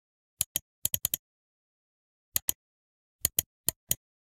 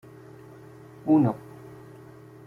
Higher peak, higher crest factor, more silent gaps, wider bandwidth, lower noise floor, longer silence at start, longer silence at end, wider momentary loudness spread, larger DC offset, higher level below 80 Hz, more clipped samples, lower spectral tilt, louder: first, -2 dBFS vs -10 dBFS; first, 34 dB vs 18 dB; first, 0.46-0.55 s, 0.62-0.82 s, 1.19-2.32 s, 2.42-2.48 s, 2.55-3.19 s, 3.46-3.64 s, 3.76-3.87 s vs none; first, 16.5 kHz vs 4.2 kHz; first, under -90 dBFS vs -47 dBFS; second, 0.4 s vs 1.05 s; second, 0.3 s vs 1.1 s; second, 4 LU vs 26 LU; neither; first, -58 dBFS vs -66 dBFS; neither; second, -0.5 dB/octave vs -10 dB/octave; second, -31 LUFS vs -24 LUFS